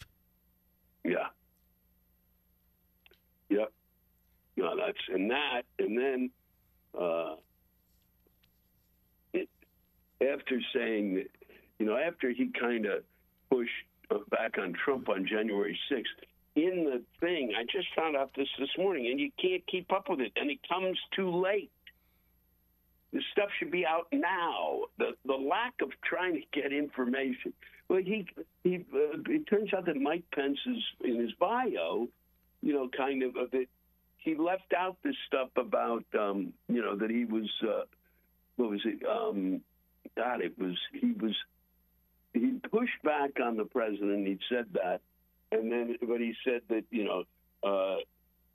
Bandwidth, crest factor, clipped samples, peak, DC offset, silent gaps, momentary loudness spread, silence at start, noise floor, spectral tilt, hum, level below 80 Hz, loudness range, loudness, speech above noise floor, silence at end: 13 kHz; 18 dB; under 0.1%; -14 dBFS; under 0.1%; none; 7 LU; 0 s; -71 dBFS; -7.5 dB/octave; none; -72 dBFS; 5 LU; -33 LUFS; 39 dB; 0.5 s